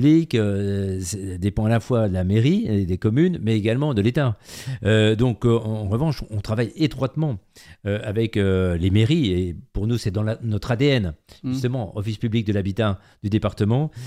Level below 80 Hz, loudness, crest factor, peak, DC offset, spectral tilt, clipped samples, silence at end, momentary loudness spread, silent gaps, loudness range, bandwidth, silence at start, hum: -42 dBFS; -22 LUFS; 16 dB; -4 dBFS; under 0.1%; -7 dB/octave; under 0.1%; 0 s; 9 LU; none; 3 LU; 13 kHz; 0 s; none